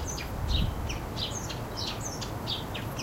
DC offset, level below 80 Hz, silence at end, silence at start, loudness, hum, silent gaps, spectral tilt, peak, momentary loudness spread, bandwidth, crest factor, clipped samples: under 0.1%; -38 dBFS; 0 s; 0 s; -33 LUFS; none; none; -4 dB/octave; -16 dBFS; 5 LU; 16 kHz; 18 dB; under 0.1%